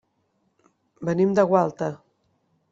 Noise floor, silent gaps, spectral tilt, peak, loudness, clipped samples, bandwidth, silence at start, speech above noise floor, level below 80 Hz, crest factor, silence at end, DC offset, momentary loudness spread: -70 dBFS; none; -8 dB/octave; -6 dBFS; -23 LUFS; under 0.1%; 7.6 kHz; 1 s; 49 dB; -66 dBFS; 20 dB; 0.75 s; under 0.1%; 13 LU